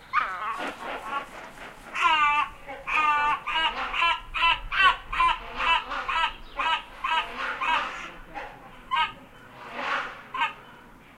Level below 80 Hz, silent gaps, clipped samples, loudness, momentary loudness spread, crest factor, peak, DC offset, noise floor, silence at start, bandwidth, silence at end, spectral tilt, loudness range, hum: -48 dBFS; none; under 0.1%; -26 LUFS; 18 LU; 20 dB; -8 dBFS; under 0.1%; -49 dBFS; 0 s; 15.5 kHz; 0 s; -1.5 dB/octave; 7 LU; none